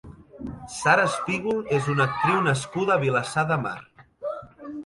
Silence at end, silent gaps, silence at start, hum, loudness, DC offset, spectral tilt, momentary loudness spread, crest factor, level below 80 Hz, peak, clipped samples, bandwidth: 0 s; none; 0.05 s; none; -24 LUFS; under 0.1%; -5 dB/octave; 17 LU; 20 dB; -56 dBFS; -6 dBFS; under 0.1%; 11.5 kHz